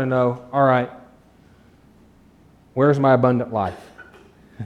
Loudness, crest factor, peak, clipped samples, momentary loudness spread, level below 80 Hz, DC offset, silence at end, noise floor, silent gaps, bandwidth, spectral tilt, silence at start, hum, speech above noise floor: -19 LUFS; 18 dB; -4 dBFS; under 0.1%; 15 LU; -56 dBFS; under 0.1%; 0 s; -52 dBFS; none; 8.4 kHz; -9 dB/octave; 0 s; none; 34 dB